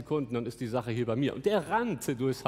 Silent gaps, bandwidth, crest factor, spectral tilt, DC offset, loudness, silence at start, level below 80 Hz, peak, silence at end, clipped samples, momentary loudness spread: none; 16 kHz; 18 dB; -6 dB/octave; under 0.1%; -31 LUFS; 0 s; -62 dBFS; -12 dBFS; 0 s; under 0.1%; 6 LU